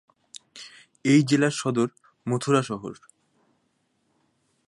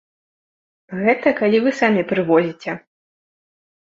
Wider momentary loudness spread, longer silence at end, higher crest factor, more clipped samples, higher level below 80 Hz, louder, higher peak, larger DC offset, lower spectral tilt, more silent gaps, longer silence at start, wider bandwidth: first, 24 LU vs 13 LU; first, 1.75 s vs 1.15 s; about the same, 20 dB vs 18 dB; neither; second, -70 dBFS vs -64 dBFS; second, -24 LUFS vs -18 LUFS; second, -8 dBFS vs -2 dBFS; neither; about the same, -5.5 dB/octave vs -6.5 dB/octave; neither; second, 0.55 s vs 0.9 s; first, 11.5 kHz vs 7.6 kHz